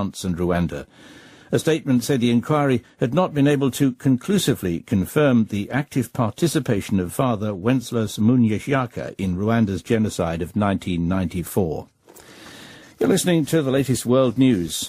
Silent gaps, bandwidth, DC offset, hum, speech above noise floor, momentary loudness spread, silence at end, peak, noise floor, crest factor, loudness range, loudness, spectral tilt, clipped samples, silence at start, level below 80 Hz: none; 15.5 kHz; under 0.1%; none; 25 dB; 7 LU; 0 s; -4 dBFS; -46 dBFS; 16 dB; 3 LU; -21 LUFS; -6 dB/octave; under 0.1%; 0 s; -48 dBFS